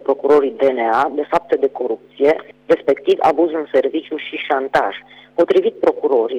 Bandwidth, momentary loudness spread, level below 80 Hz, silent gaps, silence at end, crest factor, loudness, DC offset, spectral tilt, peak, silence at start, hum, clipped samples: 8.6 kHz; 9 LU; -58 dBFS; none; 0 s; 12 dB; -17 LUFS; under 0.1%; -5.5 dB/octave; -4 dBFS; 0.05 s; none; under 0.1%